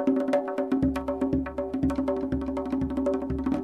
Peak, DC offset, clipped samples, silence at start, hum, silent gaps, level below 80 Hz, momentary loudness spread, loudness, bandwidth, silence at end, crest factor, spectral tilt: -12 dBFS; under 0.1%; under 0.1%; 0 s; none; none; -42 dBFS; 4 LU; -28 LUFS; 9.6 kHz; 0 s; 16 dB; -8.5 dB/octave